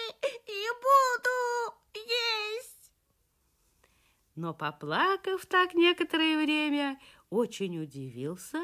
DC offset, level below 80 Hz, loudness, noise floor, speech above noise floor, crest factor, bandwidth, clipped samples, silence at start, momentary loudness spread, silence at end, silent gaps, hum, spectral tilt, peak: under 0.1%; -74 dBFS; -29 LUFS; -73 dBFS; 44 dB; 18 dB; 15.5 kHz; under 0.1%; 0 s; 15 LU; 0 s; none; none; -4 dB/octave; -12 dBFS